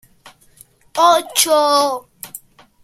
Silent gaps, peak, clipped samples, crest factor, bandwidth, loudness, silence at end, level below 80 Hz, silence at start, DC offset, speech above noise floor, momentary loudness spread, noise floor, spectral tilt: none; 0 dBFS; under 0.1%; 18 dB; 16.5 kHz; -14 LUFS; 0.45 s; -64 dBFS; 0.95 s; under 0.1%; 35 dB; 20 LU; -49 dBFS; -0.5 dB/octave